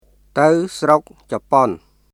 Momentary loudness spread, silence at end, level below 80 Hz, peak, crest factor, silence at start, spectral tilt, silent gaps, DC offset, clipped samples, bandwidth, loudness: 13 LU; 0.35 s; -54 dBFS; 0 dBFS; 18 dB; 0.35 s; -6 dB/octave; none; under 0.1%; under 0.1%; 14 kHz; -17 LUFS